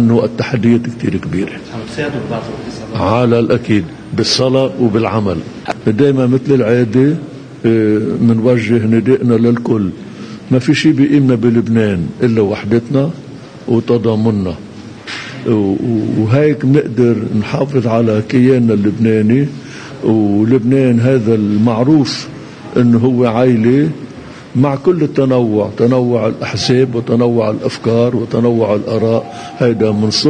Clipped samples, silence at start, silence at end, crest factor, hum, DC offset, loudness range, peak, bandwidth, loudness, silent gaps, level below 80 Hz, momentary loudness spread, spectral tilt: under 0.1%; 0 s; 0 s; 12 dB; none; under 0.1%; 3 LU; 0 dBFS; 9.8 kHz; -13 LUFS; none; -46 dBFS; 11 LU; -7 dB/octave